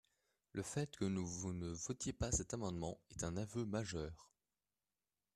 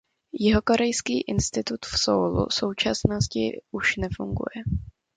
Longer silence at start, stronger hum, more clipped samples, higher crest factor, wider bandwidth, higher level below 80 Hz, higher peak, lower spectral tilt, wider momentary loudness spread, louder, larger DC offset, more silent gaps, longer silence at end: first, 0.55 s vs 0.35 s; neither; neither; about the same, 20 dB vs 24 dB; first, 13.5 kHz vs 9.6 kHz; second, -58 dBFS vs -40 dBFS; second, -26 dBFS vs -2 dBFS; about the same, -5 dB/octave vs -4.5 dB/octave; about the same, 8 LU vs 8 LU; second, -44 LUFS vs -25 LUFS; neither; neither; first, 1.1 s vs 0.25 s